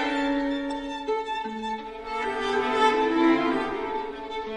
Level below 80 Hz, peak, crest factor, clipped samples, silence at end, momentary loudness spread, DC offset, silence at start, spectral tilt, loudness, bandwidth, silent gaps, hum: -52 dBFS; -8 dBFS; 18 dB; under 0.1%; 0 s; 11 LU; under 0.1%; 0 s; -4 dB/octave; -26 LUFS; 10 kHz; none; none